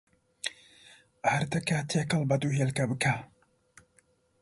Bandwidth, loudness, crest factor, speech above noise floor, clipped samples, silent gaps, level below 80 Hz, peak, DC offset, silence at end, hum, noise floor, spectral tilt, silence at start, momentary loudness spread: 11.5 kHz; -30 LUFS; 18 dB; 39 dB; under 0.1%; none; -64 dBFS; -12 dBFS; under 0.1%; 1.15 s; none; -68 dBFS; -5 dB/octave; 0.45 s; 10 LU